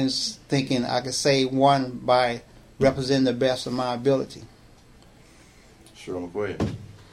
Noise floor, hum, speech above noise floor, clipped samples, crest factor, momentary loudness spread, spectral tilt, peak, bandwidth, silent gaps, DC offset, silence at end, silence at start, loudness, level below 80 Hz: -52 dBFS; none; 28 dB; under 0.1%; 20 dB; 15 LU; -5 dB/octave; -6 dBFS; 14.5 kHz; none; under 0.1%; 0.2 s; 0 s; -24 LUFS; -52 dBFS